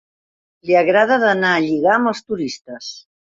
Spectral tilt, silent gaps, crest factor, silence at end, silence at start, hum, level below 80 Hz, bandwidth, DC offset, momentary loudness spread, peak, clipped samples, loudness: -5 dB/octave; 2.61-2.65 s; 16 dB; 0.25 s; 0.65 s; none; -62 dBFS; 7.8 kHz; under 0.1%; 17 LU; -2 dBFS; under 0.1%; -16 LUFS